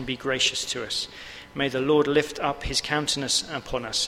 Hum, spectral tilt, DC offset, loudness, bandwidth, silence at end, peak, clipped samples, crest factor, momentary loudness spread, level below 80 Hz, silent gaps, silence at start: none; -2.5 dB/octave; under 0.1%; -25 LUFS; 16 kHz; 0 s; -8 dBFS; under 0.1%; 18 dB; 9 LU; -46 dBFS; none; 0 s